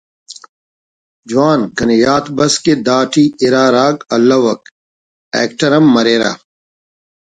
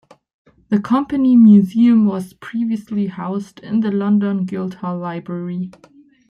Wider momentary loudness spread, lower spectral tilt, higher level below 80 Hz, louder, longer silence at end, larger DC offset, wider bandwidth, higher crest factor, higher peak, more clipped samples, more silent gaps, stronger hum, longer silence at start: second, 8 LU vs 16 LU; second, -4.5 dB/octave vs -9 dB/octave; first, -50 dBFS vs -60 dBFS; first, -12 LUFS vs -17 LUFS; first, 1.05 s vs 0.6 s; neither; first, 9.4 kHz vs 6.6 kHz; about the same, 14 dB vs 14 dB; about the same, 0 dBFS vs -2 dBFS; neither; first, 0.49-1.23 s, 4.71-5.31 s vs none; neither; second, 0.3 s vs 0.7 s